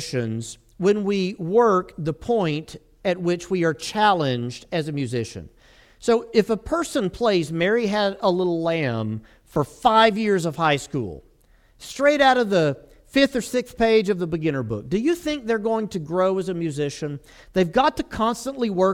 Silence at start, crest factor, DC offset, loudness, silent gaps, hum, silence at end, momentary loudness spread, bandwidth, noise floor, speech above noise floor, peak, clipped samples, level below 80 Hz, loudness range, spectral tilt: 0 s; 18 dB; under 0.1%; -22 LUFS; none; none; 0 s; 11 LU; 16.5 kHz; -56 dBFS; 35 dB; -4 dBFS; under 0.1%; -50 dBFS; 3 LU; -5.5 dB/octave